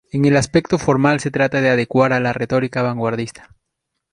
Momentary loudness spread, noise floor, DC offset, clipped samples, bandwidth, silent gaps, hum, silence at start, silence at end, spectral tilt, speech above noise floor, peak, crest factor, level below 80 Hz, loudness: 6 LU; -77 dBFS; under 0.1%; under 0.1%; 11 kHz; none; none; 0.15 s; 0.8 s; -6 dB/octave; 60 dB; -2 dBFS; 16 dB; -48 dBFS; -17 LUFS